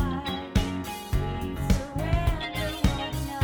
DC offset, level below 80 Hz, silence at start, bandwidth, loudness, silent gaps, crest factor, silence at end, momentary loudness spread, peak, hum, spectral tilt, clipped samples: under 0.1%; -32 dBFS; 0 s; over 20 kHz; -29 LUFS; none; 20 dB; 0 s; 5 LU; -6 dBFS; none; -5.5 dB/octave; under 0.1%